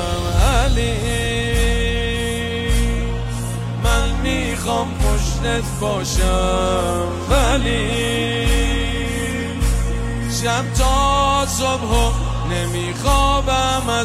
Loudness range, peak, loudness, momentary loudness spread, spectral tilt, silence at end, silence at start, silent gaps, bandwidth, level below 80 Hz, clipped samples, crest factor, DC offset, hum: 3 LU; -2 dBFS; -19 LUFS; 6 LU; -4.5 dB/octave; 0 s; 0 s; none; 15 kHz; -22 dBFS; under 0.1%; 16 dB; under 0.1%; none